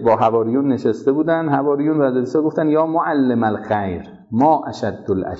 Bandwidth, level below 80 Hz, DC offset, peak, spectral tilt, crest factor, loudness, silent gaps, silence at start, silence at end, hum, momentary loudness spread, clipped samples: 7.8 kHz; -54 dBFS; under 0.1%; -4 dBFS; -8.5 dB/octave; 14 dB; -18 LUFS; none; 0 s; 0 s; none; 7 LU; under 0.1%